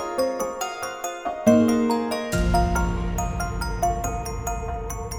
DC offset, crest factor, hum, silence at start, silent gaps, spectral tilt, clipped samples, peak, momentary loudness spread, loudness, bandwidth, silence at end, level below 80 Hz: under 0.1%; 20 dB; none; 0 s; none; -5.5 dB/octave; under 0.1%; -4 dBFS; 11 LU; -24 LUFS; over 20 kHz; 0 s; -30 dBFS